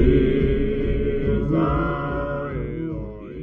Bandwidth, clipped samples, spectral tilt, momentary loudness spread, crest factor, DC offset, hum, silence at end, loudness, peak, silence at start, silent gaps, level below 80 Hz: 4.3 kHz; under 0.1%; -10.5 dB/octave; 10 LU; 16 dB; under 0.1%; none; 0 s; -23 LUFS; -4 dBFS; 0 s; none; -28 dBFS